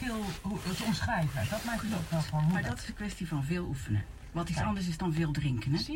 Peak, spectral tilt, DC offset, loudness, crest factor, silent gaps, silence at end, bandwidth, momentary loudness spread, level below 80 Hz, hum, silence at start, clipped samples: -20 dBFS; -6 dB/octave; under 0.1%; -33 LUFS; 14 dB; none; 0 s; 16 kHz; 6 LU; -46 dBFS; none; 0 s; under 0.1%